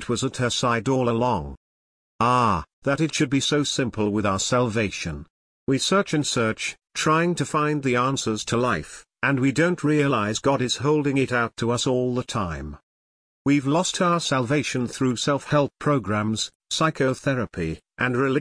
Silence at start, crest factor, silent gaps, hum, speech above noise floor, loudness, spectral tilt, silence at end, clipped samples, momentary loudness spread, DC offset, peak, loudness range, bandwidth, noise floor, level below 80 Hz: 0 s; 16 dB; 1.57-2.19 s, 2.73-2.82 s, 5.30-5.67 s, 12.83-13.45 s, 16.55-16.60 s; none; over 67 dB; -23 LUFS; -4.5 dB/octave; 0 s; under 0.1%; 7 LU; under 0.1%; -8 dBFS; 2 LU; 10.5 kHz; under -90 dBFS; -50 dBFS